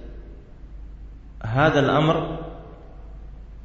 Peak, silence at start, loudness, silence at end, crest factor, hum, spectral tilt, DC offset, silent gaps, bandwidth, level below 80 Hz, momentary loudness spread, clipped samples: -6 dBFS; 0 s; -21 LUFS; 0 s; 20 dB; none; -7 dB/octave; under 0.1%; none; 7.6 kHz; -40 dBFS; 25 LU; under 0.1%